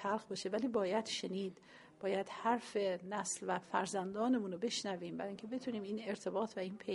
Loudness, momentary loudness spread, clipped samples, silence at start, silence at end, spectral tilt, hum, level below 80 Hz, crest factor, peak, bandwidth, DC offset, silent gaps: -39 LUFS; 7 LU; under 0.1%; 0 s; 0 s; -4 dB/octave; none; -82 dBFS; 20 dB; -20 dBFS; 11.5 kHz; under 0.1%; none